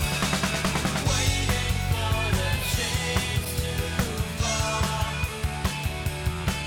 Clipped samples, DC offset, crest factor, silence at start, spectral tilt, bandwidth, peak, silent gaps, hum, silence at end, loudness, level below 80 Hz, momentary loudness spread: under 0.1%; under 0.1%; 16 dB; 0 s; -4 dB/octave; 18.5 kHz; -8 dBFS; none; none; 0 s; -26 LUFS; -34 dBFS; 5 LU